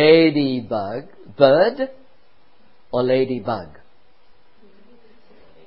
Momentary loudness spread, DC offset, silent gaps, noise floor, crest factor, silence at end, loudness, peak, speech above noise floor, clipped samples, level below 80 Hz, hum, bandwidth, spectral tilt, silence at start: 15 LU; 0.7%; none; -58 dBFS; 20 dB; 2 s; -19 LUFS; 0 dBFS; 41 dB; under 0.1%; -58 dBFS; none; 5.6 kHz; -11 dB/octave; 0 s